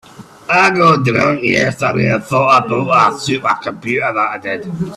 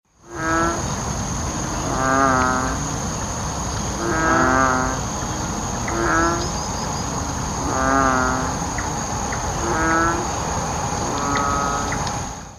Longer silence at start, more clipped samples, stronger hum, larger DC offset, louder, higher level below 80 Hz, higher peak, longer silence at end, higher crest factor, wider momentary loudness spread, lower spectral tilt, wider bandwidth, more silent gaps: about the same, 0.2 s vs 0.25 s; neither; neither; neither; first, -13 LUFS vs -21 LUFS; second, -50 dBFS vs -34 dBFS; first, 0 dBFS vs -4 dBFS; about the same, 0 s vs 0 s; about the same, 14 dB vs 18 dB; about the same, 8 LU vs 8 LU; first, -5.5 dB/octave vs -4 dB/octave; second, 13.5 kHz vs 15.5 kHz; neither